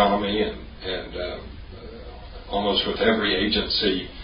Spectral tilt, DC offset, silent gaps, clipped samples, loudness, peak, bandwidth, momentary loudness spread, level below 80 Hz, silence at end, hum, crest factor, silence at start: -9 dB/octave; under 0.1%; none; under 0.1%; -24 LUFS; -4 dBFS; 5.4 kHz; 20 LU; -40 dBFS; 0 s; none; 20 dB; 0 s